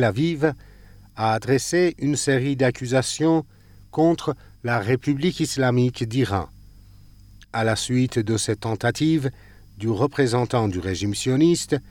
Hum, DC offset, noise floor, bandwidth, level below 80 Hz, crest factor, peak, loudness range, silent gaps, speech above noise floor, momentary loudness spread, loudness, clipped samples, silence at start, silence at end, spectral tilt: none; under 0.1%; -47 dBFS; 17 kHz; -50 dBFS; 16 dB; -6 dBFS; 2 LU; none; 26 dB; 7 LU; -22 LUFS; under 0.1%; 0 s; 0.1 s; -5.5 dB/octave